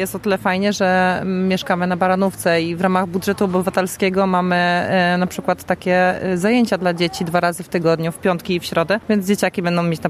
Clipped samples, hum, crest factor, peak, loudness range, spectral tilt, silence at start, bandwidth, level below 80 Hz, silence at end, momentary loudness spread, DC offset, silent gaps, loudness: under 0.1%; none; 14 dB; -2 dBFS; 1 LU; -5.5 dB/octave; 0 s; 15 kHz; -52 dBFS; 0 s; 4 LU; under 0.1%; none; -18 LUFS